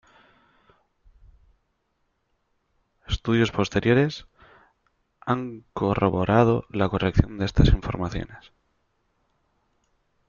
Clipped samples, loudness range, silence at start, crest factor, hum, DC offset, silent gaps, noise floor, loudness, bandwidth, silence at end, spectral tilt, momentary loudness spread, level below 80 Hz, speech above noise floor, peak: under 0.1%; 6 LU; 3.1 s; 24 dB; none; under 0.1%; none; -73 dBFS; -23 LUFS; 7.2 kHz; 1.95 s; -7.5 dB/octave; 13 LU; -36 dBFS; 51 dB; -2 dBFS